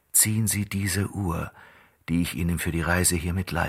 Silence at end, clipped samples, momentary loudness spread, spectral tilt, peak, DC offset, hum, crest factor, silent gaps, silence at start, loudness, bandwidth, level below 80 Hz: 0 s; under 0.1%; 9 LU; -4 dB/octave; -6 dBFS; under 0.1%; none; 20 dB; none; 0.15 s; -25 LUFS; 16 kHz; -42 dBFS